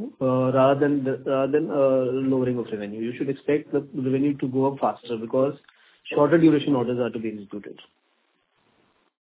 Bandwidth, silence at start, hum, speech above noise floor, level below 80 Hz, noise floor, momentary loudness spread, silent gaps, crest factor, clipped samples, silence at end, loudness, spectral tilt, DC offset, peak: 4 kHz; 0 s; none; 46 dB; -66 dBFS; -69 dBFS; 13 LU; none; 18 dB; under 0.1%; 1.65 s; -23 LUFS; -11.5 dB/octave; under 0.1%; -6 dBFS